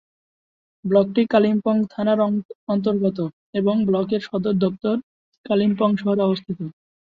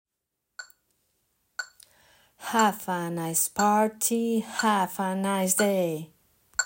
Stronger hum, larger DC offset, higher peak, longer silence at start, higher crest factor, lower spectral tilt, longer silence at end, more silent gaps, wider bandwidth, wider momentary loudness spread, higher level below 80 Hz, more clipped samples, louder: neither; neither; first, -4 dBFS vs -8 dBFS; first, 0.85 s vs 0.6 s; about the same, 18 dB vs 20 dB; first, -9.5 dB/octave vs -3.5 dB/octave; first, 0.5 s vs 0 s; first, 2.45-2.49 s, 2.55-2.67 s, 3.33-3.53 s, 5.03-5.32 s, 5.38-5.44 s vs none; second, 5.2 kHz vs 16.5 kHz; second, 9 LU vs 18 LU; first, -62 dBFS vs -72 dBFS; neither; first, -21 LUFS vs -26 LUFS